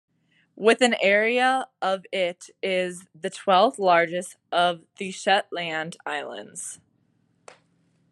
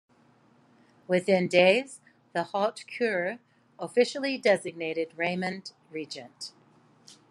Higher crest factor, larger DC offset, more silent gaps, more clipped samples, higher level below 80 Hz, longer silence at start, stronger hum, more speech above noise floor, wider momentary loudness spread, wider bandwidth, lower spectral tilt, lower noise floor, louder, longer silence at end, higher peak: about the same, 20 dB vs 22 dB; neither; neither; neither; about the same, -82 dBFS vs -82 dBFS; second, 0.55 s vs 1.1 s; neither; first, 43 dB vs 35 dB; second, 15 LU vs 19 LU; about the same, 12.5 kHz vs 11.5 kHz; second, -3 dB/octave vs -5 dB/octave; first, -67 dBFS vs -62 dBFS; first, -23 LUFS vs -27 LUFS; first, 1.35 s vs 0.8 s; about the same, -6 dBFS vs -8 dBFS